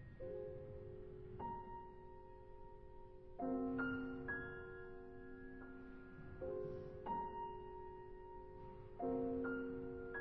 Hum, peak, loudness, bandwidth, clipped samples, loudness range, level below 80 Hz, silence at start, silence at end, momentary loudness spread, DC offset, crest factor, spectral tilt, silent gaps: none; -30 dBFS; -48 LUFS; 4.8 kHz; under 0.1%; 4 LU; -62 dBFS; 0 s; 0 s; 16 LU; under 0.1%; 18 dB; -6.5 dB/octave; none